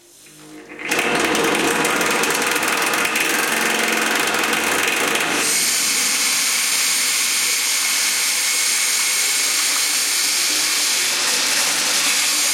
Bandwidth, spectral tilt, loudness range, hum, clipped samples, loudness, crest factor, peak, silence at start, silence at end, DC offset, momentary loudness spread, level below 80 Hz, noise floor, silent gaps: 17 kHz; 0.5 dB/octave; 1 LU; none; under 0.1%; -16 LUFS; 16 dB; -4 dBFS; 0.25 s; 0 s; under 0.1%; 2 LU; -62 dBFS; -44 dBFS; none